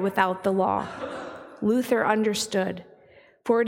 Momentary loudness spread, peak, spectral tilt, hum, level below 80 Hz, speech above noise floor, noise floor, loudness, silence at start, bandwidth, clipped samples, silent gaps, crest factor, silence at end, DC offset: 14 LU; -6 dBFS; -4.5 dB/octave; none; -64 dBFS; 31 dB; -55 dBFS; -25 LUFS; 0 s; 17.5 kHz; under 0.1%; none; 20 dB; 0 s; under 0.1%